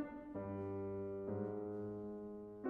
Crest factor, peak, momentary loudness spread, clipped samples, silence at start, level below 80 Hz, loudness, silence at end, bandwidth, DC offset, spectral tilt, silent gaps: 14 dB; -30 dBFS; 5 LU; under 0.1%; 0 s; -72 dBFS; -46 LUFS; 0 s; 3.5 kHz; under 0.1%; -11 dB/octave; none